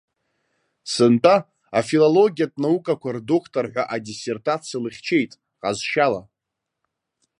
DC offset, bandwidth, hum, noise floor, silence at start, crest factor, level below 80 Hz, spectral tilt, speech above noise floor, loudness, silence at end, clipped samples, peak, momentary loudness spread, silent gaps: under 0.1%; 11 kHz; none; -83 dBFS; 0.85 s; 20 dB; -66 dBFS; -5.5 dB/octave; 62 dB; -21 LUFS; 1.2 s; under 0.1%; -2 dBFS; 13 LU; none